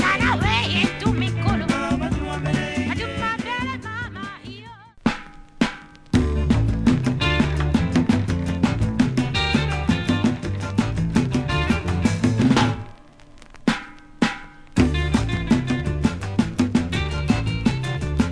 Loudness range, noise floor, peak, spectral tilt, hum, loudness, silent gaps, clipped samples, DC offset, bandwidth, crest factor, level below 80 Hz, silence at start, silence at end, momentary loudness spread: 5 LU; -45 dBFS; -6 dBFS; -6 dB/octave; none; -22 LUFS; none; under 0.1%; 0.1%; 11 kHz; 16 dB; -32 dBFS; 0 s; 0 s; 7 LU